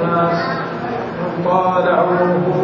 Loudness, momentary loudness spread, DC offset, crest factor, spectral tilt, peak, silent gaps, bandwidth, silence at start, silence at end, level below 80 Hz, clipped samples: -17 LUFS; 8 LU; under 0.1%; 14 dB; -8.5 dB/octave; -2 dBFS; none; 6.8 kHz; 0 s; 0 s; -52 dBFS; under 0.1%